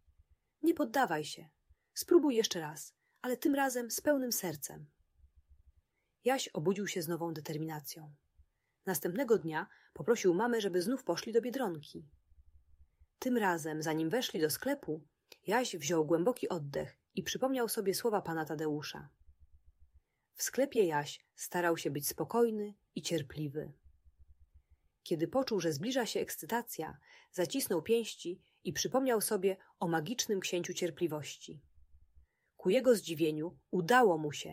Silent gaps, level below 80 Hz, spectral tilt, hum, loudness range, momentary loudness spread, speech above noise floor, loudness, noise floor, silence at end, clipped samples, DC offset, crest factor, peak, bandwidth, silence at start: none; -70 dBFS; -4 dB/octave; none; 4 LU; 14 LU; 41 dB; -34 LUFS; -75 dBFS; 0 s; under 0.1%; under 0.1%; 20 dB; -14 dBFS; 16 kHz; 0.65 s